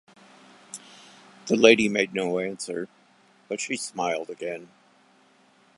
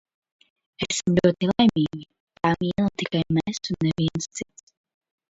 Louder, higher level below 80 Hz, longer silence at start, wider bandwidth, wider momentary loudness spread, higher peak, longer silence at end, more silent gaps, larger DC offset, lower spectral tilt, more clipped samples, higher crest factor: about the same, -24 LUFS vs -24 LUFS; second, -70 dBFS vs -52 dBFS; about the same, 0.75 s vs 0.8 s; first, 11.5 kHz vs 8 kHz; first, 24 LU vs 13 LU; first, -2 dBFS vs -6 dBFS; first, 1.15 s vs 0.9 s; second, none vs 2.20-2.27 s; neither; second, -3.5 dB/octave vs -5.5 dB/octave; neither; first, 26 dB vs 20 dB